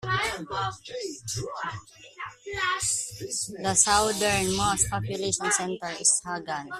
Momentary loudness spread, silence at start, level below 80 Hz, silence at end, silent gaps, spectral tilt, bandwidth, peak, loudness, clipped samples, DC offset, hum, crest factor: 14 LU; 0 s; -50 dBFS; 0 s; none; -2 dB/octave; 15.5 kHz; -4 dBFS; -26 LUFS; under 0.1%; under 0.1%; none; 24 dB